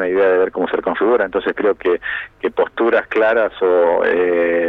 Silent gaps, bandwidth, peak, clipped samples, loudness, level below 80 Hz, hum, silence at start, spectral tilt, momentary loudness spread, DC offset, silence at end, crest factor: none; 4.4 kHz; -4 dBFS; under 0.1%; -16 LUFS; -52 dBFS; none; 0 s; -7 dB/octave; 5 LU; under 0.1%; 0 s; 12 dB